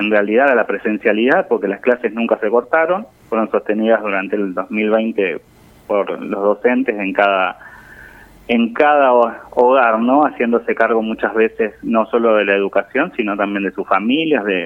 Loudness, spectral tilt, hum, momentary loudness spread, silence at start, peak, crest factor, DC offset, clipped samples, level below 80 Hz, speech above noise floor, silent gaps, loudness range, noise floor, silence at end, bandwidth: -16 LUFS; -7.5 dB/octave; none; 7 LU; 0 s; 0 dBFS; 16 dB; under 0.1%; under 0.1%; -56 dBFS; 25 dB; none; 4 LU; -41 dBFS; 0 s; 5.2 kHz